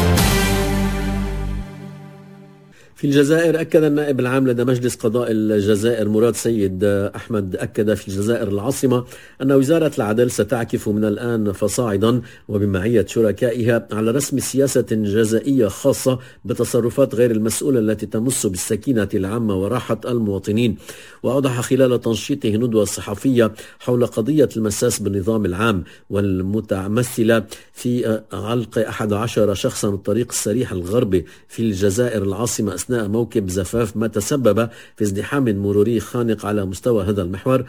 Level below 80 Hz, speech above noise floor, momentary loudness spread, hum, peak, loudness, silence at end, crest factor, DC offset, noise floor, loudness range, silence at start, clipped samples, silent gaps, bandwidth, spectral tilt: -36 dBFS; 28 dB; 6 LU; none; -2 dBFS; -19 LUFS; 0 s; 16 dB; 0.3%; -46 dBFS; 3 LU; 0 s; under 0.1%; none; 16 kHz; -5.5 dB/octave